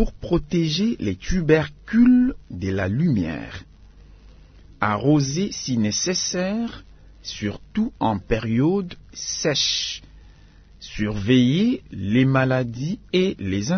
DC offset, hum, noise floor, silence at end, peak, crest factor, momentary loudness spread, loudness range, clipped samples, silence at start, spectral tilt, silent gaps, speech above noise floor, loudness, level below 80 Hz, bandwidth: under 0.1%; none; -48 dBFS; 0 s; -2 dBFS; 20 dB; 13 LU; 4 LU; under 0.1%; 0 s; -5 dB/octave; none; 27 dB; -22 LUFS; -40 dBFS; 6.6 kHz